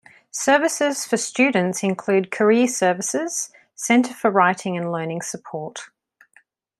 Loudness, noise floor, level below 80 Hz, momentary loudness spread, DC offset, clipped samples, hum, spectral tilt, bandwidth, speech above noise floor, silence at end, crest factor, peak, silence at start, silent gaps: -20 LUFS; -58 dBFS; -72 dBFS; 14 LU; under 0.1%; under 0.1%; none; -4 dB/octave; 13.5 kHz; 38 dB; 0.95 s; 18 dB; -2 dBFS; 0.35 s; none